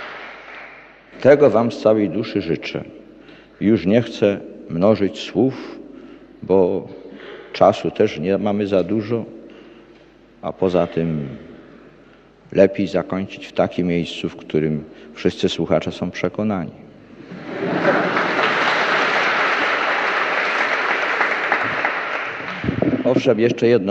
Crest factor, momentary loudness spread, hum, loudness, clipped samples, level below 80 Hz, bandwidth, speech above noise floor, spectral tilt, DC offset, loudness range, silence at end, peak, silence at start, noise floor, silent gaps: 20 dB; 17 LU; none; -19 LUFS; under 0.1%; -54 dBFS; 8.4 kHz; 30 dB; -6 dB/octave; under 0.1%; 5 LU; 0 s; 0 dBFS; 0 s; -48 dBFS; none